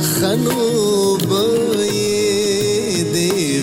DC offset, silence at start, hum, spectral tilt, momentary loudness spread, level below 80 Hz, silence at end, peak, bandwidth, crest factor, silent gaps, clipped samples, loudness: under 0.1%; 0 s; none; -4 dB/octave; 2 LU; -52 dBFS; 0 s; -6 dBFS; 16.5 kHz; 10 dB; none; under 0.1%; -16 LUFS